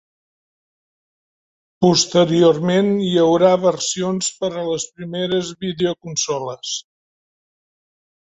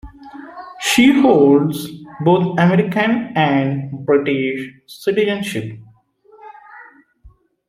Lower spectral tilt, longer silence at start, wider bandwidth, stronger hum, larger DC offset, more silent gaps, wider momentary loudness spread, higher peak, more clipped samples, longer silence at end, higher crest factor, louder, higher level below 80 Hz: second, -4.5 dB/octave vs -6 dB/octave; first, 1.8 s vs 0.05 s; second, 8.4 kHz vs 15.5 kHz; neither; neither; neither; second, 11 LU vs 21 LU; about the same, -2 dBFS vs 0 dBFS; neither; first, 1.55 s vs 0.4 s; about the same, 18 dB vs 16 dB; about the same, -18 LUFS vs -16 LUFS; second, -60 dBFS vs -52 dBFS